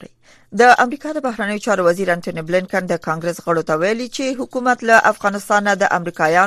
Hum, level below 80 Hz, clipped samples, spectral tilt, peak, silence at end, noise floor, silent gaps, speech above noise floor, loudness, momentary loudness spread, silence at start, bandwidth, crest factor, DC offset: none; -58 dBFS; under 0.1%; -4.5 dB/octave; 0 dBFS; 0 s; -44 dBFS; none; 27 dB; -17 LUFS; 10 LU; 0.5 s; 14.5 kHz; 18 dB; under 0.1%